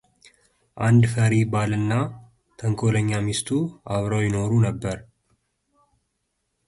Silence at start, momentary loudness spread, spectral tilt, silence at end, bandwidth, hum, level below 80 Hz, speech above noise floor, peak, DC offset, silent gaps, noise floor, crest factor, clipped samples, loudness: 0.75 s; 11 LU; -6.5 dB/octave; 1.65 s; 11.5 kHz; none; -50 dBFS; 54 dB; -6 dBFS; under 0.1%; none; -75 dBFS; 16 dB; under 0.1%; -23 LUFS